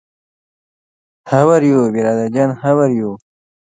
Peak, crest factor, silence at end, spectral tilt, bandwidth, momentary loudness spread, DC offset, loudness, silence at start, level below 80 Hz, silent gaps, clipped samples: 0 dBFS; 16 dB; 0.55 s; -8 dB/octave; 9.4 kHz; 9 LU; under 0.1%; -14 LUFS; 1.25 s; -60 dBFS; none; under 0.1%